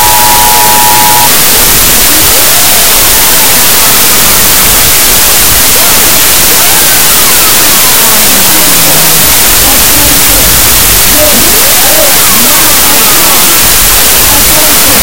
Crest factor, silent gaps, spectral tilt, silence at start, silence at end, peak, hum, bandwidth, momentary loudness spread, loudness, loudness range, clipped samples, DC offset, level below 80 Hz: 6 dB; none; -0.5 dB/octave; 0 s; 0 s; 0 dBFS; none; over 20 kHz; 0 LU; -1 LUFS; 0 LU; 20%; 20%; -22 dBFS